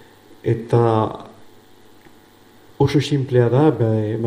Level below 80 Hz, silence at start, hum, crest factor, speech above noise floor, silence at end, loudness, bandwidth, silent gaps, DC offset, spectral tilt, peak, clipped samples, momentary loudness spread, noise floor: -54 dBFS; 0.45 s; none; 18 dB; 31 dB; 0 s; -18 LUFS; 14.5 kHz; none; under 0.1%; -8 dB/octave; -2 dBFS; under 0.1%; 9 LU; -48 dBFS